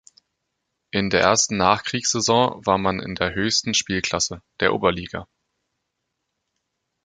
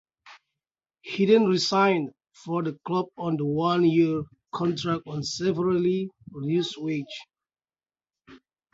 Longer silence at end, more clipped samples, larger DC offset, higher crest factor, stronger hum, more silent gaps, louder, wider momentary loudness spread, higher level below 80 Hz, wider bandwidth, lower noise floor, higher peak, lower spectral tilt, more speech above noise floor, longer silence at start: first, 1.8 s vs 0.35 s; neither; neither; about the same, 22 dB vs 18 dB; neither; neither; first, -21 LUFS vs -25 LUFS; second, 8 LU vs 15 LU; first, -48 dBFS vs -64 dBFS; first, 10.5 kHz vs 8 kHz; second, -78 dBFS vs under -90 dBFS; first, -2 dBFS vs -8 dBFS; second, -3 dB/octave vs -6 dB/octave; second, 57 dB vs over 65 dB; first, 0.95 s vs 0.25 s